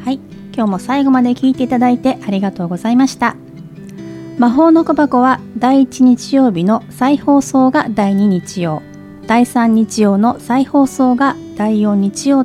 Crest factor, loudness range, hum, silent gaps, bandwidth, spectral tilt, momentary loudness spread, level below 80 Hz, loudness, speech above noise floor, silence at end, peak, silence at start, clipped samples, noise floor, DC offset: 12 dB; 3 LU; none; none; 13.5 kHz; -6 dB/octave; 10 LU; -50 dBFS; -13 LUFS; 20 dB; 0 s; 0 dBFS; 0 s; under 0.1%; -32 dBFS; under 0.1%